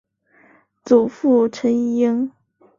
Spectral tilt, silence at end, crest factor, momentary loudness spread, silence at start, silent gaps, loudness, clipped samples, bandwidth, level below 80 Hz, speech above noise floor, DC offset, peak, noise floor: -6.5 dB/octave; 0.5 s; 18 dB; 5 LU; 0.85 s; none; -18 LUFS; under 0.1%; 7.4 kHz; -64 dBFS; 38 dB; under 0.1%; -2 dBFS; -55 dBFS